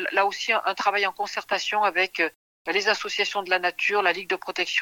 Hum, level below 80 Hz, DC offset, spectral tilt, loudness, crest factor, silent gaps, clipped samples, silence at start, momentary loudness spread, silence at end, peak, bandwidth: none; -74 dBFS; under 0.1%; -1.5 dB/octave; -24 LUFS; 18 dB; 2.35-2.65 s; under 0.1%; 0 s; 5 LU; 0 s; -8 dBFS; 19 kHz